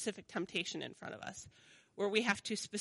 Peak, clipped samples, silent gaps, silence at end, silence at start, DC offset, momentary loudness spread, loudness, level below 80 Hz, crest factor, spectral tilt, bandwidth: -18 dBFS; under 0.1%; none; 0 s; 0 s; under 0.1%; 17 LU; -38 LUFS; -76 dBFS; 22 dB; -3 dB/octave; 11.5 kHz